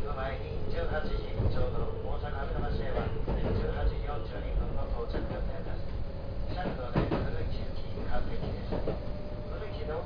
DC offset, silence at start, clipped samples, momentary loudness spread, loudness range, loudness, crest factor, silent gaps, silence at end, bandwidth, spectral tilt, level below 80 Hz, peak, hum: under 0.1%; 0 s; under 0.1%; 7 LU; 2 LU; -35 LUFS; 16 dB; none; 0 s; 5.2 kHz; -9 dB/octave; -34 dBFS; -14 dBFS; none